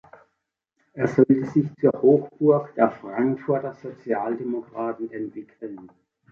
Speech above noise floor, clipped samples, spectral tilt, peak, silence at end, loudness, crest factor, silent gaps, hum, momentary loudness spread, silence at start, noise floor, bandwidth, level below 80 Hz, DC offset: 56 dB; under 0.1%; -10 dB/octave; -4 dBFS; 0.45 s; -23 LUFS; 20 dB; none; none; 19 LU; 0.95 s; -78 dBFS; 6.8 kHz; -66 dBFS; under 0.1%